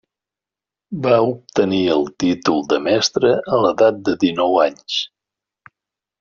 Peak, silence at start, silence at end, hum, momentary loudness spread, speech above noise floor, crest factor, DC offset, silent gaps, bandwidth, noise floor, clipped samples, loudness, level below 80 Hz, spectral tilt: -2 dBFS; 0.9 s; 1.15 s; none; 7 LU; 72 dB; 16 dB; under 0.1%; none; 7.4 kHz; -88 dBFS; under 0.1%; -17 LUFS; -58 dBFS; -4 dB/octave